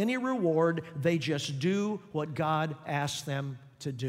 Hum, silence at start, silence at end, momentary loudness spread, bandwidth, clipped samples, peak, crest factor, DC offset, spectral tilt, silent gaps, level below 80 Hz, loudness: none; 0 s; 0 s; 8 LU; 16 kHz; under 0.1%; -14 dBFS; 16 dB; under 0.1%; -5.5 dB/octave; none; -70 dBFS; -31 LUFS